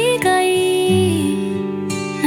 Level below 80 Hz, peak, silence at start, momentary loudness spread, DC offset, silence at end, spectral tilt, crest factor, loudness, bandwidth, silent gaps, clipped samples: -56 dBFS; -4 dBFS; 0 s; 8 LU; under 0.1%; 0 s; -5 dB/octave; 14 dB; -17 LUFS; 17 kHz; none; under 0.1%